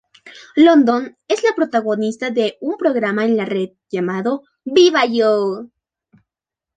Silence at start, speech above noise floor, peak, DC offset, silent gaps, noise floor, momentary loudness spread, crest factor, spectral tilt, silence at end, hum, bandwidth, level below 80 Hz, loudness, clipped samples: 0.25 s; 71 dB; -2 dBFS; under 0.1%; none; -87 dBFS; 11 LU; 16 dB; -5 dB/octave; 1.1 s; none; 9.2 kHz; -66 dBFS; -17 LUFS; under 0.1%